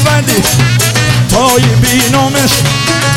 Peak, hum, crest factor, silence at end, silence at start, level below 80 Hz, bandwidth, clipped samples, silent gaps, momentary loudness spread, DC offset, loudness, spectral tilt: 0 dBFS; none; 8 dB; 0 s; 0 s; -28 dBFS; 17 kHz; under 0.1%; none; 2 LU; under 0.1%; -8 LUFS; -4 dB/octave